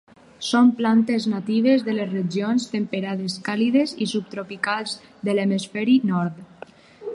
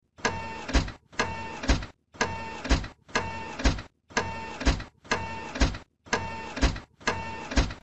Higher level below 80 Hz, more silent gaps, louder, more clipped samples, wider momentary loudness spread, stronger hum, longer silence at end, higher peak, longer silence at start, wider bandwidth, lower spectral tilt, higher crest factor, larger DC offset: second, -70 dBFS vs -34 dBFS; neither; first, -22 LUFS vs -31 LUFS; neither; first, 11 LU vs 7 LU; neither; about the same, 0 s vs 0 s; first, -6 dBFS vs -10 dBFS; first, 0.4 s vs 0 s; first, 11 kHz vs 8.4 kHz; about the same, -5.5 dB/octave vs -4.5 dB/octave; about the same, 16 dB vs 20 dB; second, under 0.1% vs 0.4%